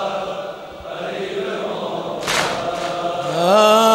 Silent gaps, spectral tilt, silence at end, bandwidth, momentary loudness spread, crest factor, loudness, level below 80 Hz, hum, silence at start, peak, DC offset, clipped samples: none; -3.5 dB/octave; 0 s; 16 kHz; 16 LU; 16 dB; -20 LUFS; -54 dBFS; none; 0 s; -2 dBFS; under 0.1%; under 0.1%